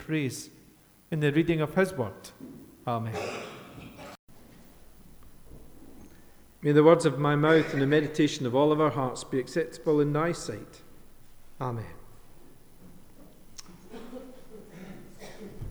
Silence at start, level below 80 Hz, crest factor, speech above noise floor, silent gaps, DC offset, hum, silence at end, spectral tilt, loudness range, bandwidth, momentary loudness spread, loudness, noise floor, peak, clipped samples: 0 s; -54 dBFS; 22 dB; 32 dB; 4.19-4.28 s; under 0.1%; none; 0 s; -6.5 dB/octave; 21 LU; over 20 kHz; 24 LU; -27 LUFS; -58 dBFS; -8 dBFS; under 0.1%